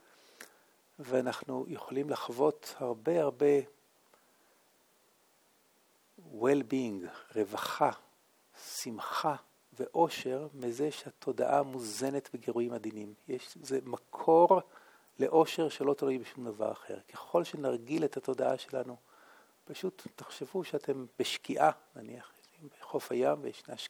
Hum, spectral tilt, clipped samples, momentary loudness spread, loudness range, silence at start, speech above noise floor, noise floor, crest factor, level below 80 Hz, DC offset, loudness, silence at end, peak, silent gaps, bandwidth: none; -5 dB/octave; under 0.1%; 18 LU; 7 LU; 0.4 s; 36 dB; -69 dBFS; 22 dB; -86 dBFS; under 0.1%; -33 LUFS; 0 s; -12 dBFS; none; 19.5 kHz